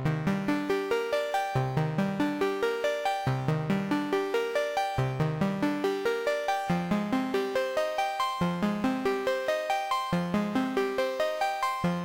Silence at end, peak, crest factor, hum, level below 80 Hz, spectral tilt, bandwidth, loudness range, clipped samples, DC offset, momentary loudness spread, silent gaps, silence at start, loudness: 0 s; -18 dBFS; 12 dB; none; -56 dBFS; -6 dB/octave; 17 kHz; 0 LU; under 0.1%; under 0.1%; 1 LU; none; 0 s; -29 LUFS